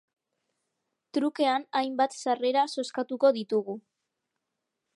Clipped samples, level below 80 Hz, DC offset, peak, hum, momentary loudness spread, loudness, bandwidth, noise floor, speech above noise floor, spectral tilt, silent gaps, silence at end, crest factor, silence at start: under 0.1%; -88 dBFS; under 0.1%; -10 dBFS; none; 8 LU; -28 LUFS; 11.5 kHz; -84 dBFS; 57 dB; -4 dB/octave; none; 1.15 s; 20 dB; 1.15 s